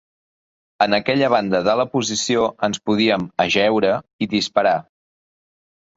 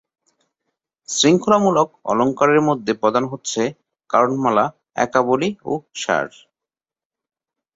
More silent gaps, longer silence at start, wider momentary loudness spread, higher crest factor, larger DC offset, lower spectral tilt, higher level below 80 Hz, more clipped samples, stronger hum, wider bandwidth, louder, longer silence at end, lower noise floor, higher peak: first, 4.13-4.19 s vs none; second, 0.8 s vs 1.1 s; second, 4 LU vs 9 LU; about the same, 18 dB vs 18 dB; neither; about the same, -4 dB/octave vs -4.5 dB/octave; first, -56 dBFS vs -62 dBFS; neither; neither; about the same, 8 kHz vs 8 kHz; about the same, -19 LUFS vs -18 LUFS; second, 1.15 s vs 1.5 s; about the same, under -90 dBFS vs under -90 dBFS; about the same, -2 dBFS vs -2 dBFS